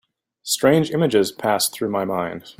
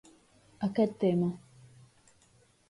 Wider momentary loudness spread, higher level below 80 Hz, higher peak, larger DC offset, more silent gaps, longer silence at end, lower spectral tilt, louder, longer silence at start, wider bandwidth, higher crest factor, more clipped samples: about the same, 8 LU vs 9 LU; first, -58 dBFS vs -70 dBFS; first, -2 dBFS vs -16 dBFS; neither; neither; second, 0.1 s vs 1.3 s; second, -4.5 dB/octave vs -8.5 dB/octave; first, -20 LUFS vs -30 LUFS; second, 0.45 s vs 0.6 s; first, 16.5 kHz vs 11.5 kHz; about the same, 18 dB vs 18 dB; neither